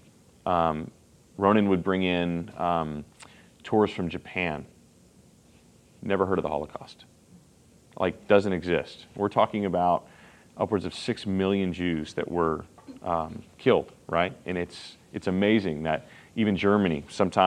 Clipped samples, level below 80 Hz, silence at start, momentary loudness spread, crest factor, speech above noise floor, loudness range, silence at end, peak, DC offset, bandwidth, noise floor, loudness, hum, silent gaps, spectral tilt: under 0.1%; -58 dBFS; 0.45 s; 15 LU; 22 dB; 31 dB; 5 LU; 0 s; -4 dBFS; under 0.1%; 11 kHz; -57 dBFS; -27 LUFS; none; none; -7 dB/octave